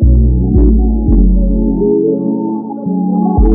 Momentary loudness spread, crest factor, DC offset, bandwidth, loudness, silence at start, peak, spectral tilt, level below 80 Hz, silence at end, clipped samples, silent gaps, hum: 7 LU; 10 dB; under 0.1%; 1.3 kHz; -12 LUFS; 0 s; 0 dBFS; -17 dB/octave; -12 dBFS; 0 s; under 0.1%; none; none